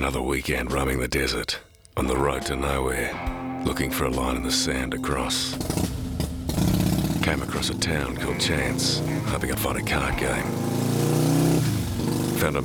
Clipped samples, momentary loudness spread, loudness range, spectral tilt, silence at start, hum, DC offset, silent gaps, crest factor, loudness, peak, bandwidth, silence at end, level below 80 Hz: under 0.1%; 6 LU; 2 LU; -4.5 dB/octave; 0 s; none; under 0.1%; none; 16 dB; -25 LUFS; -8 dBFS; over 20 kHz; 0 s; -36 dBFS